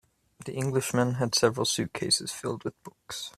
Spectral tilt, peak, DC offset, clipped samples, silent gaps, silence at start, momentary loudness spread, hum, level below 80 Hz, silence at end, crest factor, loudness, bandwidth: -3.5 dB/octave; -8 dBFS; under 0.1%; under 0.1%; none; 0.4 s; 14 LU; none; -64 dBFS; 0.05 s; 22 dB; -27 LUFS; 15 kHz